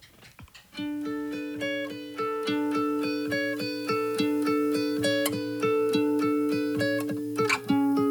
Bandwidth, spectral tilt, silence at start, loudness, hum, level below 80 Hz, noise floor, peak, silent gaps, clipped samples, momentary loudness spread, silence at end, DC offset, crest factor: over 20 kHz; -5 dB/octave; 0.05 s; -28 LUFS; none; -68 dBFS; -51 dBFS; -10 dBFS; none; under 0.1%; 8 LU; 0 s; under 0.1%; 18 dB